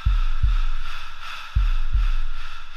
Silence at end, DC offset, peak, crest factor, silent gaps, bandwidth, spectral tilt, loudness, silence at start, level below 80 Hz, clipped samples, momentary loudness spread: 0 s; under 0.1%; -8 dBFS; 12 dB; none; 6.2 kHz; -4.5 dB/octave; -28 LUFS; 0 s; -20 dBFS; under 0.1%; 10 LU